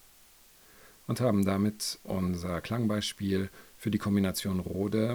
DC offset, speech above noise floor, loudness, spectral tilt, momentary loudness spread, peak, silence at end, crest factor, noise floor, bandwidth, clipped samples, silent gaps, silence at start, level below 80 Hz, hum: under 0.1%; 28 dB; -31 LUFS; -5.5 dB/octave; 8 LU; -14 dBFS; 0 s; 16 dB; -58 dBFS; over 20 kHz; under 0.1%; none; 0.85 s; -62 dBFS; none